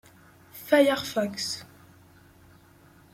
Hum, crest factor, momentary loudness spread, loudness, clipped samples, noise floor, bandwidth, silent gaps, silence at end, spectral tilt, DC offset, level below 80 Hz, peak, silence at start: none; 22 dB; 21 LU; -25 LUFS; under 0.1%; -55 dBFS; 16.5 kHz; none; 1.5 s; -3.5 dB/octave; under 0.1%; -66 dBFS; -8 dBFS; 0.55 s